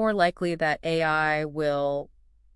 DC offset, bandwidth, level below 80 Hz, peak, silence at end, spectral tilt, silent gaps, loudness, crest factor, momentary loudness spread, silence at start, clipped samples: under 0.1%; 12 kHz; -52 dBFS; -8 dBFS; 0.5 s; -6 dB/octave; none; -26 LUFS; 18 dB; 6 LU; 0 s; under 0.1%